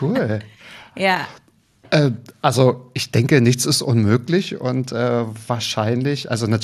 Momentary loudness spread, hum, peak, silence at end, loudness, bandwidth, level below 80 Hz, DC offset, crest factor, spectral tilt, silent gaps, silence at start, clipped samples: 9 LU; none; -2 dBFS; 0 s; -19 LUFS; 14 kHz; -58 dBFS; under 0.1%; 18 dB; -5.5 dB/octave; none; 0 s; under 0.1%